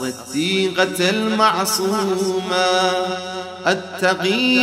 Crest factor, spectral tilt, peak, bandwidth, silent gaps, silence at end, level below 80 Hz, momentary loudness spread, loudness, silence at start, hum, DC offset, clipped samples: 16 dB; -3.5 dB/octave; -2 dBFS; 16 kHz; none; 0 s; -64 dBFS; 7 LU; -18 LUFS; 0 s; none; under 0.1%; under 0.1%